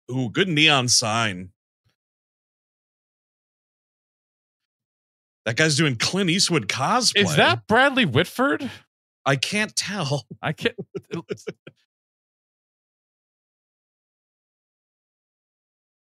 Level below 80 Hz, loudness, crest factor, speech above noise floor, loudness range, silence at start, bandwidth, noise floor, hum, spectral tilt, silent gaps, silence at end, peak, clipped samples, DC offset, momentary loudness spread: -68 dBFS; -20 LUFS; 22 dB; over 68 dB; 15 LU; 0.1 s; 15.5 kHz; under -90 dBFS; none; -3.5 dB/octave; 1.56-1.84 s, 1.95-5.45 s, 8.87-9.25 s; 4.55 s; -2 dBFS; under 0.1%; under 0.1%; 16 LU